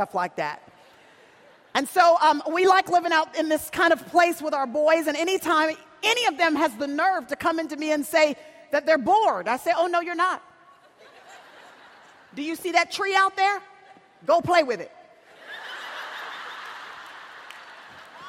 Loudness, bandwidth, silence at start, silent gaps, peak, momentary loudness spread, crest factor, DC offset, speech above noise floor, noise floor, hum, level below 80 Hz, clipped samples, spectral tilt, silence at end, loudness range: -23 LUFS; 16.5 kHz; 0 s; none; -4 dBFS; 19 LU; 20 dB; under 0.1%; 32 dB; -54 dBFS; none; -68 dBFS; under 0.1%; -3 dB/octave; 0 s; 7 LU